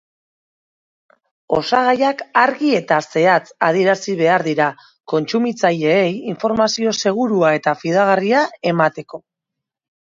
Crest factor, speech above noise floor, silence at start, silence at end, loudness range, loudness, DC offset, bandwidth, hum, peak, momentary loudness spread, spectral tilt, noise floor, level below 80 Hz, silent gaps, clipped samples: 18 dB; 66 dB; 1.5 s; 0.9 s; 2 LU; -17 LUFS; under 0.1%; 7.8 kHz; none; 0 dBFS; 6 LU; -5 dB/octave; -82 dBFS; -62 dBFS; 5.00-5.04 s; under 0.1%